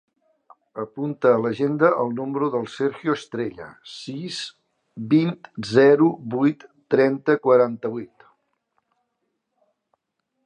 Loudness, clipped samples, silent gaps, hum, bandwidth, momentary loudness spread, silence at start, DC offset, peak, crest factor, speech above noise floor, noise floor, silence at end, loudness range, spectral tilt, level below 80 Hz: -21 LUFS; under 0.1%; none; none; 9.8 kHz; 18 LU; 0.75 s; under 0.1%; -2 dBFS; 20 dB; 56 dB; -77 dBFS; 2.4 s; 6 LU; -7 dB/octave; -68 dBFS